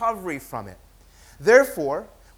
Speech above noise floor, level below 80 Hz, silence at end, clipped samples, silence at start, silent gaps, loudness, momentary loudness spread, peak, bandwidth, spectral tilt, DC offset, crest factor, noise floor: 29 dB; -52 dBFS; 0.3 s; under 0.1%; 0 s; none; -21 LUFS; 18 LU; -2 dBFS; 17 kHz; -4.5 dB/octave; under 0.1%; 20 dB; -51 dBFS